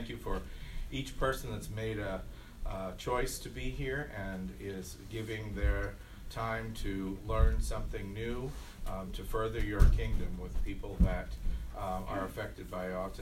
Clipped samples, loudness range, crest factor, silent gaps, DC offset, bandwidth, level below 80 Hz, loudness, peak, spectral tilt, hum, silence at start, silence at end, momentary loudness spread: under 0.1%; 4 LU; 24 dB; none; under 0.1%; 16 kHz; -36 dBFS; -37 LUFS; -10 dBFS; -6 dB/octave; none; 0 s; 0 s; 10 LU